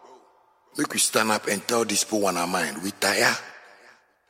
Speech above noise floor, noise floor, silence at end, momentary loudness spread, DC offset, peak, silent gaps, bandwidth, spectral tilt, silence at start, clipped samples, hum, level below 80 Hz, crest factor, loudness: 35 dB; -60 dBFS; 0.7 s; 10 LU; under 0.1%; -2 dBFS; none; 16.5 kHz; -2 dB/octave; 0.05 s; under 0.1%; none; -72 dBFS; 24 dB; -23 LUFS